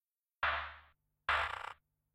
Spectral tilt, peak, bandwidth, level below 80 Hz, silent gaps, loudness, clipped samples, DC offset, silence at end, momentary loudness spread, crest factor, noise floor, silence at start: -2.5 dB/octave; -20 dBFS; 16 kHz; -58 dBFS; none; -37 LUFS; under 0.1%; under 0.1%; 0.4 s; 19 LU; 20 dB; -67 dBFS; 0.4 s